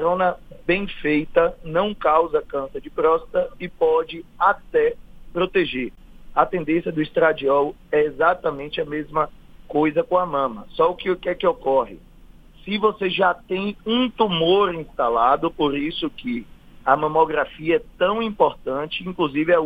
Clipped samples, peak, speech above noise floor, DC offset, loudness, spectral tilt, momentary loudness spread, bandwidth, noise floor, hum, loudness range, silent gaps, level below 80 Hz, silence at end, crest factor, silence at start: under 0.1%; -2 dBFS; 25 dB; under 0.1%; -21 LUFS; -7.5 dB/octave; 9 LU; 5 kHz; -46 dBFS; none; 2 LU; none; -46 dBFS; 0 s; 20 dB; 0 s